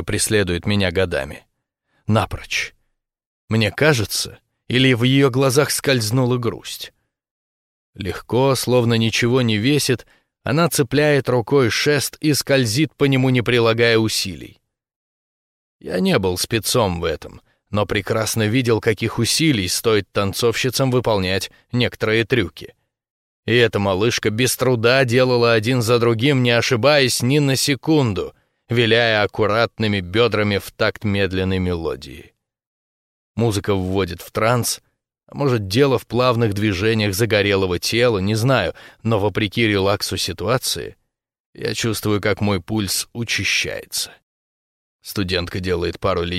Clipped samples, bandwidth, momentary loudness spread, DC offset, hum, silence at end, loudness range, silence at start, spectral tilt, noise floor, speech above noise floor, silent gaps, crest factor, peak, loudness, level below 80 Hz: under 0.1%; 16 kHz; 10 LU; under 0.1%; none; 0 s; 6 LU; 0 s; -4.5 dB/octave; -70 dBFS; 52 dB; 3.26-3.48 s, 7.31-7.93 s, 14.96-15.79 s, 23.10-23.43 s, 32.66-33.34 s, 41.40-41.53 s, 44.23-44.99 s; 18 dB; -2 dBFS; -18 LUFS; -46 dBFS